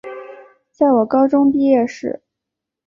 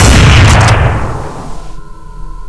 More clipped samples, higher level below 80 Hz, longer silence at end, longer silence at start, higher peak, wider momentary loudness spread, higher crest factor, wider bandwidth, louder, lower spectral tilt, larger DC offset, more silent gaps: second, under 0.1% vs 1%; second, -60 dBFS vs -14 dBFS; first, 0.75 s vs 0 s; about the same, 0.05 s vs 0 s; second, -4 dBFS vs 0 dBFS; about the same, 19 LU vs 21 LU; first, 14 dB vs 8 dB; second, 7.2 kHz vs 11 kHz; second, -15 LUFS vs -7 LUFS; first, -7 dB/octave vs -4.5 dB/octave; neither; neither